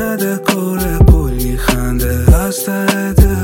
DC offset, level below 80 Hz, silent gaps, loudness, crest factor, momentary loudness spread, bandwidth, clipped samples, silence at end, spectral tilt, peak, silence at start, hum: under 0.1%; -16 dBFS; none; -14 LUFS; 12 dB; 6 LU; 17 kHz; under 0.1%; 0 s; -6 dB/octave; 0 dBFS; 0 s; none